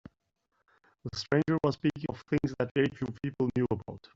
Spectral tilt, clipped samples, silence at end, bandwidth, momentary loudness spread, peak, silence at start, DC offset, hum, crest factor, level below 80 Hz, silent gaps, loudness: -6 dB/octave; under 0.1%; 0.2 s; 7.8 kHz; 10 LU; -10 dBFS; 1.05 s; under 0.1%; none; 22 dB; -58 dBFS; 2.71-2.75 s; -31 LUFS